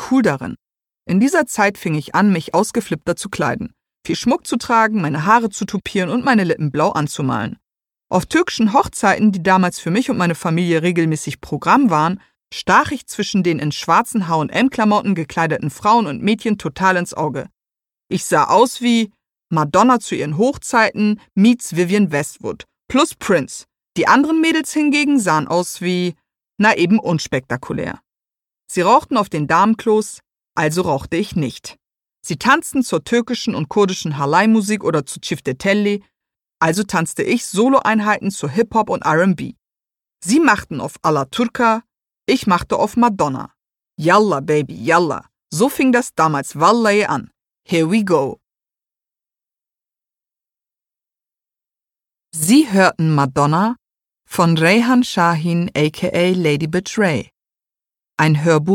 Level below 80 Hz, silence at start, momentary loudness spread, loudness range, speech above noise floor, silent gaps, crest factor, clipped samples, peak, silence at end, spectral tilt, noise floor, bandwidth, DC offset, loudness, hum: -52 dBFS; 0 s; 11 LU; 3 LU; over 74 dB; none; 16 dB; under 0.1%; 0 dBFS; 0 s; -5 dB/octave; under -90 dBFS; 16.5 kHz; under 0.1%; -17 LUFS; none